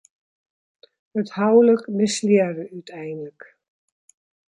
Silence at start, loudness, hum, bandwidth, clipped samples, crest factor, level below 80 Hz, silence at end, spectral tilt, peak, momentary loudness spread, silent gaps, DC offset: 1.15 s; -19 LUFS; none; 11.5 kHz; under 0.1%; 18 dB; -72 dBFS; 1.3 s; -5.5 dB/octave; -4 dBFS; 19 LU; none; under 0.1%